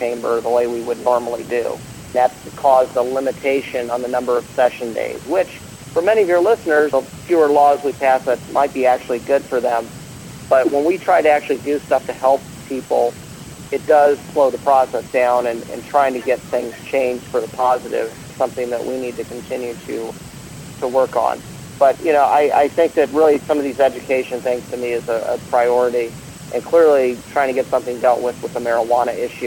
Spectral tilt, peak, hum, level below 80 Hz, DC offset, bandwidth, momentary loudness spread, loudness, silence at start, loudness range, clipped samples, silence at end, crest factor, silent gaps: -5 dB/octave; 0 dBFS; none; -52 dBFS; under 0.1%; 17.5 kHz; 12 LU; -18 LUFS; 0 s; 5 LU; under 0.1%; 0 s; 16 dB; none